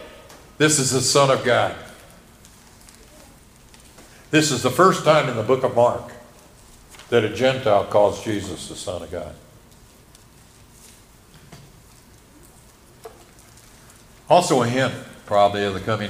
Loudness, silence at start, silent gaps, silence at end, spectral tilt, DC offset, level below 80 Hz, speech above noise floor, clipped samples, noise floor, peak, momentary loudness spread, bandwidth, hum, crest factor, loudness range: -19 LUFS; 0 s; none; 0 s; -4 dB/octave; under 0.1%; -54 dBFS; 30 dB; under 0.1%; -49 dBFS; -2 dBFS; 16 LU; 15.5 kHz; none; 20 dB; 9 LU